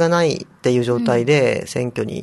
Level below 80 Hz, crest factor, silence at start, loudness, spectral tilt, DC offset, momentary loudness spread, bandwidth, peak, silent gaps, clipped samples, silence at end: -54 dBFS; 16 dB; 0 s; -18 LUFS; -6 dB/octave; under 0.1%; 7 LU; 12.5 kHz; -2 dBFS; none; under 0.1%; 0 s